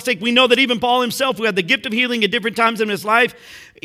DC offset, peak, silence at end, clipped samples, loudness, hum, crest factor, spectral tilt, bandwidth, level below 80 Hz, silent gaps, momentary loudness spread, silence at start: under 0.1%; 0 dBFS; 0.2 s; under 0.1%; -16 LUFS; none; 18 dB; -3.5 dB/octave; 16.5 kHz; -62 dBFS; none; 6 LU; 0 s